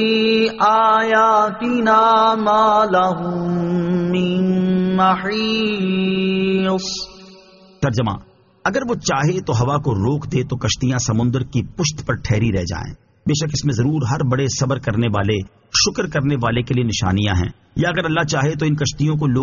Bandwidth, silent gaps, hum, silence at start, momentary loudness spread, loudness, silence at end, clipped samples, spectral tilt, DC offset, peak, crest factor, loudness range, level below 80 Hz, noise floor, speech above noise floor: 7.4 kHz; none; none; 0 s; 8 LU; -18 LUFS; 0 s; under 0.1%; -5 dB/octave; under 0.1%; -2 dBFS; 14 dB; 6 LU; -42 dBFS; -46 dBFS; 28 dB